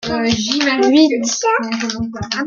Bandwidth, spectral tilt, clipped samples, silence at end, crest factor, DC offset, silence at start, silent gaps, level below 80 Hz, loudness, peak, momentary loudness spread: 7.6 kHz; -3.5 dB/octave; under 0.1%; 0 s; 16 dB; under 0.1%; 0 s; none; -46 dBFS; -15 LUFS; 0 dBFS; 10 LU